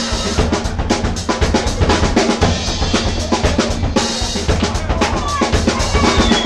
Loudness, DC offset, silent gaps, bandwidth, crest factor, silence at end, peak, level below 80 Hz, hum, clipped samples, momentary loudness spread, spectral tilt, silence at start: -16 LUFS; under 0.1%; none; 12.5 kHz; 14 dB; 0 s; 0 dBFS; -22 dBFS; none; under 0.1%; 4 LU; -4.5 dB/octave; 0 s